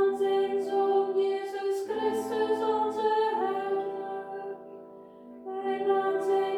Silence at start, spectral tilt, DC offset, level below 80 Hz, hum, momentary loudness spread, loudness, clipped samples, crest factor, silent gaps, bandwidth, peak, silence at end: 0 s; -4.5 dB/octave; under 0.1%; -76 dBFS; none; 17 LU; -29 LUFS; under 0.1%; 14 dB; none; 13 kHz; -16 dBFS; 0 s